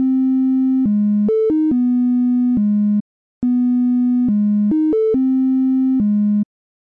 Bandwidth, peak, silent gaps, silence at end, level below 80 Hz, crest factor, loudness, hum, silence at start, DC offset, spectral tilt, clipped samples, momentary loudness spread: 2.4 kHz; -10 dBFS; 3.01-3.41 s; 0.4 s; -54 dBFS; 6 dB; -16 LUFS; none; 0 s; under 0.1%; -12.5 dB/octave; under 0.1%; 2 LU